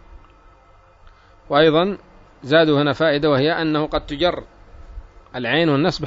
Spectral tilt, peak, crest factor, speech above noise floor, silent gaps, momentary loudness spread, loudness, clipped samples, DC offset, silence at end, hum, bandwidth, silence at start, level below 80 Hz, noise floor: -7 dB/octave; -4 dBFS; 16 dB; 33 dB; none; 14 LU; -18 LUFS; under 0.1%; under 0.1%; 0 s; none; 7.8 kHz; 0.1 s; -44 dBFS; -50 dBFS